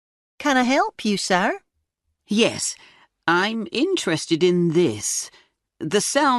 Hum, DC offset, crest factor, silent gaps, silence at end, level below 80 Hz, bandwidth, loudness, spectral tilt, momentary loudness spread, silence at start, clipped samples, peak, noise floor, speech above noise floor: none; under 0.1%; 16 dB; none; 0 s; -64 dBFS; 12 kHz; -21 LUFS; -3.5 dB/octave; 9 LU; 0.4 s; under 0.1%; -6 dBFS; -74 dBFS; 54 dB